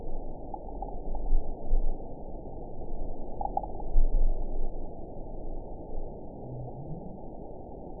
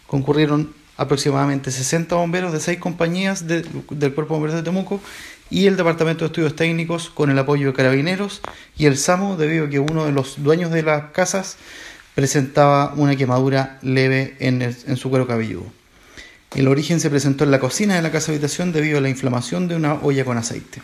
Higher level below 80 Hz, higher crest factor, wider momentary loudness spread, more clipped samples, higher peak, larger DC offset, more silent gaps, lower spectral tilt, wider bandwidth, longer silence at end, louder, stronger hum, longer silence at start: first, -30 dBFS vs -50 dBFS; about the same, 18 dB vs 18 dB; about the same, 10 LU vs 9 LU; neither; second, -10 dBFS vs 0 dBFS; first, 0.3% vs under 0.1%; neither; first, -14.5 dB/octave vs -5.5 dB/octave; second, 1 kHz vs 14 kHz; about the same, 0 s vs 0 s; second, -39 LUFS vs -19 LUFS; neither; about the same, 0 s vs 0.1 s